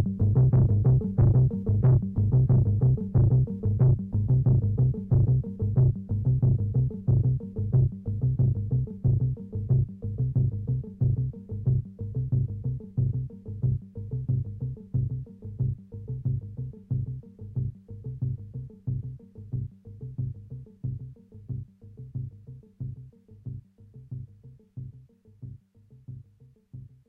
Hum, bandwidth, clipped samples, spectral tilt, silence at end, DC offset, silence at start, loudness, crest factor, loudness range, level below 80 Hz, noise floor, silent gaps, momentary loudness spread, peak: none; 1.5 kHz; under 0.1%; -14 dB/octave; 0.2 s; under 0.1%; 0 s; -26 LUFS; 14 dB; 19 LU; -40 dBFS; -57 dBFS; none; 21 LU; -12 dBFS